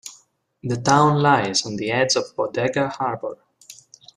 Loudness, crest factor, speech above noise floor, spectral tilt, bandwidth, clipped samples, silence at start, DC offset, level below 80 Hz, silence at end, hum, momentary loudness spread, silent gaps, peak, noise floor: -20 LUFS; 20 dB; 36 dB; -4.5 dB/octave; 12.5 kHz; under 0.1%; 0.05 s; under 0.1%; -60 dBFS; 0.45 s; none; 15 LU; none; -2 dBFS; -56 dBFS